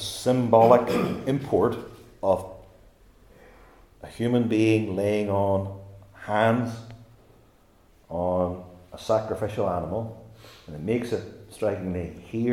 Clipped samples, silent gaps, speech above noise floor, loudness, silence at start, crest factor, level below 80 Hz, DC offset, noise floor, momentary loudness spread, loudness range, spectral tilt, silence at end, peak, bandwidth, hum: under 0.1%; none; 34 dB; -25 LUFS; 0 s; 22 dB; -56 dBFS; under 0.1%; -58 dBFS; 21 LU; 6 LU; -7 dB/octave; 0 s; -4 dBFS; 17.5 kHz; none